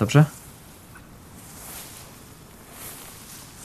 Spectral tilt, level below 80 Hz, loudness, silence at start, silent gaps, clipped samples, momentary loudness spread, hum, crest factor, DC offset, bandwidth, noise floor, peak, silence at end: -6 dB/octave; -54 dBFS; -27 LUFS; 0 s; none; under 0.1%; 24 LU; none; 24 dB; under 0.1%; 14 kHz; -46 dBFS; -4 dBFS; 0 s